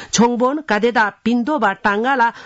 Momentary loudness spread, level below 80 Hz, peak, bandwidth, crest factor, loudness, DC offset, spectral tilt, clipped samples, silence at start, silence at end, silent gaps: 3 LU; -54 dBFS; -4 dBFS; 8 kHz; 14 dB; -17 LUFS; under 0.1%; -4 dB/octave; under 0.1%; 0 s; 0 s; none